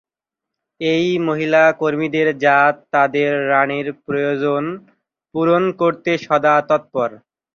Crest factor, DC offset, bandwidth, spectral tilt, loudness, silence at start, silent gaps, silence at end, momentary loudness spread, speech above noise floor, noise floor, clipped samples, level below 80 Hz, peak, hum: 16 dB; under 0.1%; 7.2 kHz; -6.5 dB/octave; -17 LUFS; 0.8 s; none; 0.4 s; 9 LU; 68 dB; -84 dBFS; under 0.1%; -64 dBFS; -2 dBFS; none